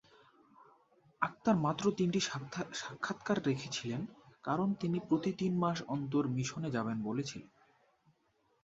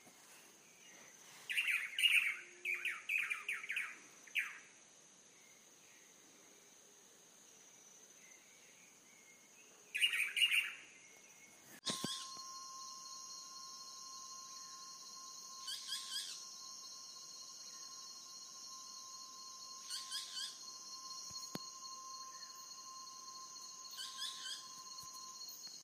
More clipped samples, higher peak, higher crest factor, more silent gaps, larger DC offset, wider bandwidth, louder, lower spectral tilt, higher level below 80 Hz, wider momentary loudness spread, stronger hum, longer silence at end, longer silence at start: neither; first, -14 dBFS vs -20 dBFS; about the same, 22 dB vs 26 dB; neither; neither; second, 8 kHz vs 15.5 kHz; first, -35 LUFS vs -41 LUFS; first, -5.5 dB/octave vs 1 dB/octave; first, -72 dBFS vs under -90 dBFS; second, 9 LU vs 25 LU; neither; first, 1.15 s vs 0 s; first, 0.6 s vs 0 s